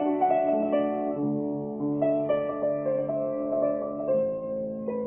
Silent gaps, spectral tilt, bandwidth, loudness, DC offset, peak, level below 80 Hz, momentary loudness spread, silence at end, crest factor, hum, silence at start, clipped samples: none; -11.5 dB/octave; 3.5 kHz; -27 LUFS; under 0.1%; -12 dBFS; -64 dBFS; 7 LU; 0 s; 14 dB; none; 0 s; under 0.1%